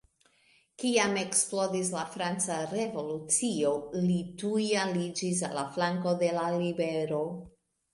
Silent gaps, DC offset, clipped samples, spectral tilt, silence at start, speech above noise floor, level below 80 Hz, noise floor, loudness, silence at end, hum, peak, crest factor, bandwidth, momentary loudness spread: none; under 0.1%; under 0.1%; -4 dB/octave; 0.8 s; 36 dB; -68 dBFS; -66 dBFS; -30 LUFS; 0.45 s; none; -12 dBFS; 18 dB; 11.5 kHz; 7 LU